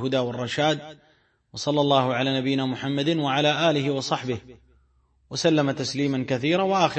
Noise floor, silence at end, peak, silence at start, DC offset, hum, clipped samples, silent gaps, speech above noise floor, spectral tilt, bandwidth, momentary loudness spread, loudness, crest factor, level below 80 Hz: -63 dBFS; 0 s; -6 dBFS; 0 s; under 0.1%; none; under 0.1%; none; 40 dB; -5 dB/octave; 8.8 kHz; 10 LU; -24 LUFS; 18 dB; -62 dBFS